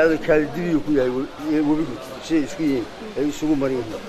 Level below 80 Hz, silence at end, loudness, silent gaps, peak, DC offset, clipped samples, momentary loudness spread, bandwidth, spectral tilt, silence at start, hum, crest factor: -44 dBFS; 0 s; -22 LUFS; none; -6 dBFS; under 0.1%; under 0.1%; 7 LU; 14 kHz; -6 dB/octave; 0 s; none; 16 dB